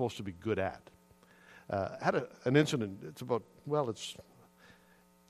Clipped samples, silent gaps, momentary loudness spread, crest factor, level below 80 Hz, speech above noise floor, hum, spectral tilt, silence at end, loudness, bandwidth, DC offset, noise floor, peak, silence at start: under 0.1%; none; 14 LU; 24 dB; -70 dBFS; 30 dB; none; -6 dB/octave; 1.1 s; -35 LUFS; 14.5 kHz; under 0.1%; -64 dBFS; -12 dBFS; 0 s